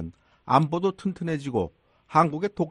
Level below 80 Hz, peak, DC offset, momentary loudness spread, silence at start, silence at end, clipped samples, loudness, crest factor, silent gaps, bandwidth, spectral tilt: -56 dBFS; -6 dBFS; under 0.1%; 9 LU; 0 s; 0 s; under 0.1%; -25 LUFS; 20 dB; none; 11 kHz; -7.5 dB/octave